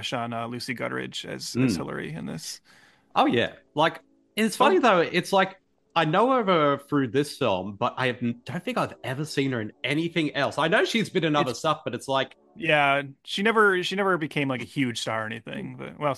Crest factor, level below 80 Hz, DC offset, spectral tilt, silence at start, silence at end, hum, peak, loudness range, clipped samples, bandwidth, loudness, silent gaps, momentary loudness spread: 20 dB; -66 dBFS; under 0.1%; -5 dB/octave; 0 s; 0 s; none; -6 dBFS; 5 LU; under 0.1%; 12.5 kHz; -25 LUFS; none; 13 LU